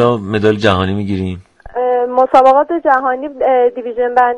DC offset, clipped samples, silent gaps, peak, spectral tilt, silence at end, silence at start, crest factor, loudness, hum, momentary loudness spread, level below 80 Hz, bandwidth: under 0.1%; under 0.1%; none; 0 dBFS; -7 dB/octave; 0 s; 0 s; 12 dB; -13 LUFS; none; 11 LU; -46 dBFS; 9.4 kHz